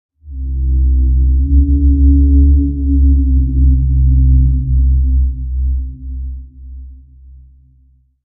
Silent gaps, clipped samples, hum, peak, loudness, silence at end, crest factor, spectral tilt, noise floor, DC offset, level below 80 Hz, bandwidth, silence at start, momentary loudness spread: none; under 0.1%; none; 0 dBFS; -13 LUFS; 1.3 s; 12 dB; -23.5 dB/octave; -50 dBFS; under 0.1%; -12 dBFS; 0.5 kHz; 0.25 s; 16 LU